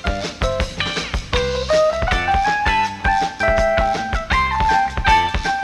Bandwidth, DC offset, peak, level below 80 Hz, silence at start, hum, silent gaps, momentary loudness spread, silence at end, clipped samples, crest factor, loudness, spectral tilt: 13 kHz; under 0.1%; -2 dBFS; -26 dBFS; 0 s; none; none; 6 LU; 0 s; under 0.1%; 16 dB; -18 LUFS; -4 dB/octave